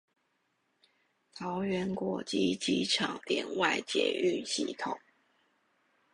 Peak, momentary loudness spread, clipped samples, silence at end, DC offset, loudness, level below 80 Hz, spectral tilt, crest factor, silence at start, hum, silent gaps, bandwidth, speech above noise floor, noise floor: -14 dBFS; 9 LU; under 0.1%; 1.15 s; under 0.1%; -32 LUFS; -70 dBFS; -3.5 dB/octave; 20 dB; 1.35 s; none; none; 11.5 kHz; 45 dB; -77 dBFS